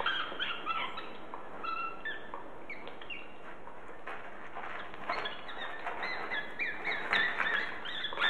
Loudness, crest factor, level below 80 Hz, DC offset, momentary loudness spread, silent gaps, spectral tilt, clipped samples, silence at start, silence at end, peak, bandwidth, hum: -36 LUFS; 28 dB; -64 dBFS; 0.9%; 16 LU; none; -3 dB/octave; under 0.1%; 0 s; 0 s; -10 dBFS; 13 kHz; none